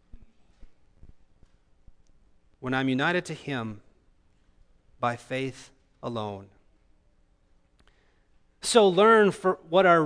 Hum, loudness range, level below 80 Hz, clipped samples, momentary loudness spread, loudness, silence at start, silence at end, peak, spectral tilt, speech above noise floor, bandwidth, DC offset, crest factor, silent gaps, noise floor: none; 11 LU; -58 dBFS; under 0.1%; 21 LU; -25 LUFS; 0.15 s; 0 s; -6 dBFS; -4.5 dB/octave; 40 dB; 11 kHz; under 0.1%; 22 dB; none; -64 dBFS